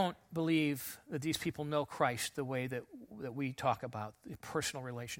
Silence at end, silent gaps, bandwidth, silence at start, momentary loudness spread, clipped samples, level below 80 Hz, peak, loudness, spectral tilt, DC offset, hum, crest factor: 0 s; none; 16.5 kHz; 0 s; 12 LU; under 0.1%; -68 dBFS; -16 dBFS; -37 LUFS; -4.5 dB/octave; under 0.1%; none; 20 dB